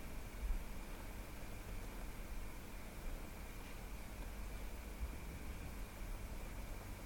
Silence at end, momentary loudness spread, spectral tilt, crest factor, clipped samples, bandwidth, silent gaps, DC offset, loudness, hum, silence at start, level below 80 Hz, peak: 0 s; 3 LU; -5 dB/octave; 18 dB; under 0.1%; 17.5 kHz; none; under 0.1%; -51 LUFS; none; 0 s; -48 dBFS; -28 dBFS